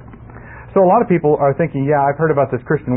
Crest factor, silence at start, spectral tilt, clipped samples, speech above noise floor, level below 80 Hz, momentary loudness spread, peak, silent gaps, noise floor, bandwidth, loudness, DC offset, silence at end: 12 dB; 0.1 s; -14 dB/octave; under 0.1%; 21 dB; -44 dBFS; 7 LU; -2 dBFS; none; -36 dBFS; 3.3 kHz; -15 LUFS; under 0.1%; 0 s